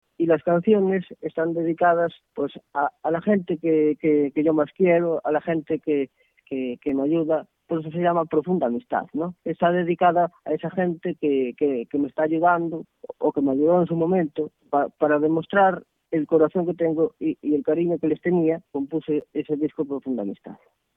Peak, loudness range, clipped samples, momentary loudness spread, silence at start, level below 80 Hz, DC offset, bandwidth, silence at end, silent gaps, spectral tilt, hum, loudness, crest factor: -6 dBFS; 3 LU; under 0.1%; 9 LU; 0.2 s; -66 dBFS; under 0.1%; 3.9 kHz; 0.4 s; none; -10.5 dB/octave; none; -23 LUFS; 16 dB